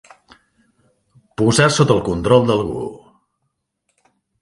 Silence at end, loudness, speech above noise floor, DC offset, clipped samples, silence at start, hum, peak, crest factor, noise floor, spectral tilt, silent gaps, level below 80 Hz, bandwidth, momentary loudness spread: 1.45 s; -16 LUFS; 58 dB; under 0.1%; under 0.1%; 1.4 s; none; 0 dBFS; 18 dB; -73 dBFS; -5 dB/octave; none; -44 dBFS; 11.5 kHz; 15 LU